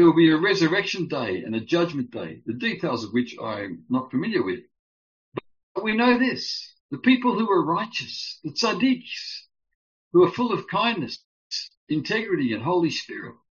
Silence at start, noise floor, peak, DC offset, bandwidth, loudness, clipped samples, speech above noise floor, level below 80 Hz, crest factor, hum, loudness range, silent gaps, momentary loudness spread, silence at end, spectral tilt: 0 s; under -90 dBFS; -6 dBFS; under 0.1%; 7.4 kHz; -24 LUFS; under 0.1%; over 67 dB; -66 dBFS; 18 dB; none; 5 LU; 4.79-5.32 s, 5.63-5.75 s, 6.80-6.89 s, 9.75-10.11 s, 11.24-11.50 s, 11.77-11.87 s; 14 LU; 0.2 s; -3.5 dB/octave